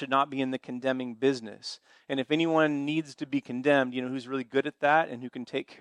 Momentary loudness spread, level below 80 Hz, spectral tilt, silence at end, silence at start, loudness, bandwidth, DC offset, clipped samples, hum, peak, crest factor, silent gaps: 11 LU; -80 dBFS; -5.5 dB/octave; 0.05 s; 0 s; -29 LUFS; 10.5 kHz; under 0.1%; under 0.1%; none; -10 dBFS; 20 dB; none